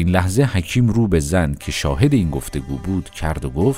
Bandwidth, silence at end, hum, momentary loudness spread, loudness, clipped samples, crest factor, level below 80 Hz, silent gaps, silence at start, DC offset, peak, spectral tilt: 16 kHz; 0 s; none; 9 LU; -19 LUFS; under 0.1%; 18 dB; -30 dBFS; none; 0 s; under 0.1%; 0 dBFS; -6.5 dB/octave